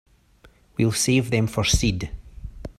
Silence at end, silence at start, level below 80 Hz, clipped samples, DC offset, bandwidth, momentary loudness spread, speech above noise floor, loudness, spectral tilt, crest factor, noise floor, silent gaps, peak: 0.05 s; 0.8 s; -34 dBFS; under 0.1%; under 0.1%; 15 kHz; 20 LU; 34 dB; -22 LUFS; -4.5 dB/octave; 18 dB; -55 dBFS; none; -6 dBFS